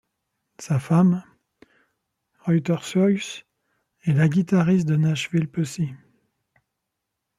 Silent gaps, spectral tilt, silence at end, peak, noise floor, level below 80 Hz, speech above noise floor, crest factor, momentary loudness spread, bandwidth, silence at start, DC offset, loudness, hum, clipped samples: none; -7 dB/octave; 1.4 s; -6 dBFS; -81 dBFS; -64 dBFS; 60 dB; 18 dB; 11 LU; 12.5 kHz; 0.6 s; under 0.1%; -22 LUFS; none; under 0.1%